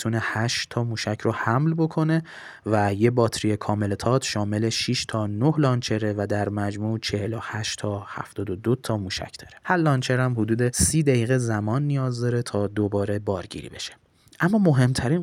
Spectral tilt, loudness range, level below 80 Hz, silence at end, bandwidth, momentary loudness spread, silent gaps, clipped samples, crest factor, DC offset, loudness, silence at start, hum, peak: -5.5 dB/octave; 4 LU; -52 dBFS; 0 s; 15.5 kHz; 10 LU; none; under 0.1%; 18 dB; under 0.1%; -24 LUFS; 0 s; none; -6 dBFS